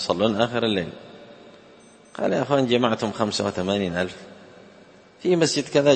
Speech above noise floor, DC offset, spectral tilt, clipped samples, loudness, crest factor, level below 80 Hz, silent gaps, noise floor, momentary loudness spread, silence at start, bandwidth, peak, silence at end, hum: 28 dB; under 0.1%; -5 dB/octave; under 0.1%; -23 LUFS; 20 dB; -60 dBFS; none; -50 dBFS; 20 LU; 0 s; 8.8 kHz; -4 dBFS; 0 s; none